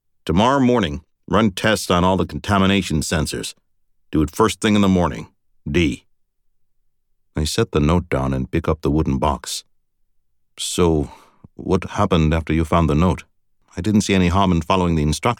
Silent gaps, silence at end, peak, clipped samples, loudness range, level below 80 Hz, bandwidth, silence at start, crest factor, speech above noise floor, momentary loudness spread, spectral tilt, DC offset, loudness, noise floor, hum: none; 0.05 s; -4 dBFS; under 0.1%; 4 LU; -34 dBFS; 18 kHz; 0.25 s; 16 dB; 45 dB; 11 LU; -5.5 dB/octave; under 0.1%; -19 LUFS; -63 dBFS; none